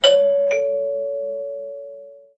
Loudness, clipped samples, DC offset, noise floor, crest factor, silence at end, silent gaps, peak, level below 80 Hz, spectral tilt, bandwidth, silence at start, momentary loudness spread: -20 LUFS; under 0.1%; under 0.1%; -40 dBFS; 18 dB; 0.2 s; none; -2 dBFS; -68 dBFS; -0.5 dB/octave; 8.2 kHz; 0 s; 20 LU